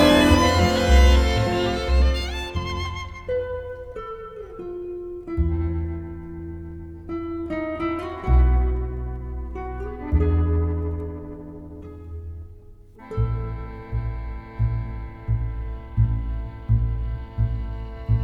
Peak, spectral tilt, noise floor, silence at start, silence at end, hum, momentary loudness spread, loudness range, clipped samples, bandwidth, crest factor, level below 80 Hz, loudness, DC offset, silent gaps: -4 dBFS; -6 dB/octave; -44 dBFS; 0 s; 0 s; none; 18 LU; 9 LU; under 0.1%; 14 kHz; 20 dB; -26 dBFS; -24 LUFS; under 0.1%; none